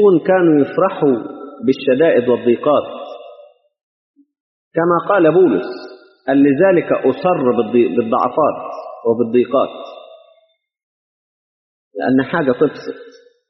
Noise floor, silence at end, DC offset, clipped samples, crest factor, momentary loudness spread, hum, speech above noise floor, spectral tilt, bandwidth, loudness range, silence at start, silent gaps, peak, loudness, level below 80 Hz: -58 dBFS; 0.4 s; under 0.1%; under 0.1%; 16 dB; 18 LU; none; 44 dB; -6 dB/octave; 6 kHz; 7 LU; 0 s; 3.83-4.14 s, 4.40-4.71 s, 10.83-11.91 s; -2 dBFS; -15 LUFS; -62 dBFS